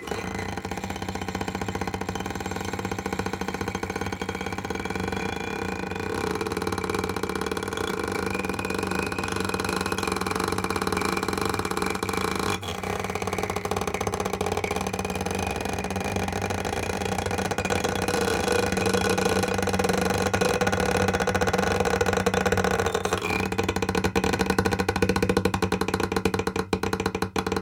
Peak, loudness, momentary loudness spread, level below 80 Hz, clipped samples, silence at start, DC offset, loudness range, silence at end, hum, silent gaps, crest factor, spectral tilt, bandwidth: -6 dBFS; -27 LUFS; 7 LU; -42 dBFS; under 0.1%; 0 s; under 0.1%; 6 LU; 0 s; none; none; 20 dB; -4.5 dB/octave; 17 kHz